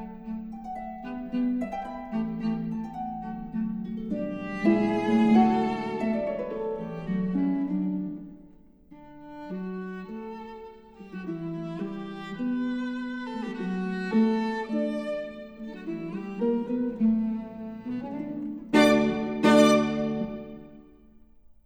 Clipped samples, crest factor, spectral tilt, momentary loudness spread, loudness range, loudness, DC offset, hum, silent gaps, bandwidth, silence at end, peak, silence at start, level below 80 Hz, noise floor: under 0.1%; 22 dB; -6.5 dB/octave; 18 LU; 11 LU; -28 LUFS; under 0.1%; none; none; 11.5 kHz; 0.15 s; -6 dBFS; 0 s; -56 dBFS; -54 dBFS